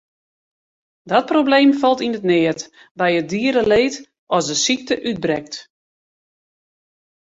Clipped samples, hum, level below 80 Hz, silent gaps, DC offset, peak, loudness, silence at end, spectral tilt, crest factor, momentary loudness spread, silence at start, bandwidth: under 0.1%; none; -56 dBFS; 2.91-2.95 s, 4.19-4.27 s; under 0.1%; -2 dBFS; -18 LUFS; 1.6 s; -4 dB/octave; 18 dB; 12 LU; 1.05 s; 8 kHz